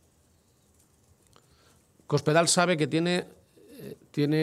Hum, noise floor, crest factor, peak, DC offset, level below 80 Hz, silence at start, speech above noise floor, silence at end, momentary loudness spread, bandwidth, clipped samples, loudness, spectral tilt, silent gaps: none; -64 dBFS; 22 dB; -8 dBFS; under 0.1%; -70 dBFS; 2.1 s; 40 dB; 0 s; 23 LU; 15 kHz; under 0.1%; -25 LUFS; -4.5 dB/octave; none